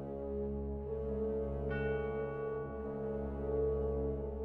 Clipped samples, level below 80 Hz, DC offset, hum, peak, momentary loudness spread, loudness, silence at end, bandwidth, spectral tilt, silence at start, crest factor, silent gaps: under 0.1%; -46 dBFS; under 0.1%; none; -24 dBFS; 6 LU; -38 LUFS; 0 s; 3.8 kHz; -10.5 dB/octave; 0 s; 12 dB; none